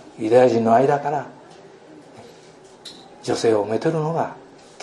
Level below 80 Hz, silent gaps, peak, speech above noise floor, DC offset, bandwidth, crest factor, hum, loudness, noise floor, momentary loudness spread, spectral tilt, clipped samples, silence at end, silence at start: -68 dBFS; none; -2 dBFS; 28 dB; under 0.1%; 11.5 kHz; 18 dB; none; -19 LUFS; -46 dBFS; 24 LU; -6 dB/octave; under 0.1%; 0.45 s; 0.15 s